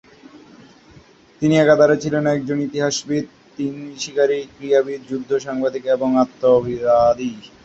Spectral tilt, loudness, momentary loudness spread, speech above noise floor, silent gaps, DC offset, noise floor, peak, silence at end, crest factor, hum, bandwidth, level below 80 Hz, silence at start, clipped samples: -5.5 dB/octave; -19 LUFS; 13 LU; 30 dB; none; under 0.1%; -48 dBFS; -2 dBFS; 0.2 s; 18 dB; none; 8.2 kHz; -54 dBFS; 0.35 s; under 0.1%